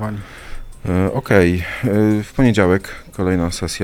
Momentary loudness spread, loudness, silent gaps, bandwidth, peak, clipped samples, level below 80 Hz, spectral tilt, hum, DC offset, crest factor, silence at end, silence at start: 17 LU; -17 LUFS; none; 16.5 kHz; 0 dBFS; under 0.1%; -34 dBFS; -6.5 dB/octave; none; under 0.1%; 18 dB; 0 s; 0 s